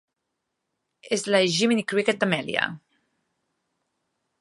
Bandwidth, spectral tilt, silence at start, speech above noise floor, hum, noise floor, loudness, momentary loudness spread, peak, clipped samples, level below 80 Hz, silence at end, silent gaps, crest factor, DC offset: 11.5 kHz; -4 dB/octave; 1.05 s; 57 dB; none; -81 dBFS; -23 LUFS; 8 LU; -4 dBFS; under 0.1%; -72 dBFS; 1.65 s; none; 24 dB; under 0.1%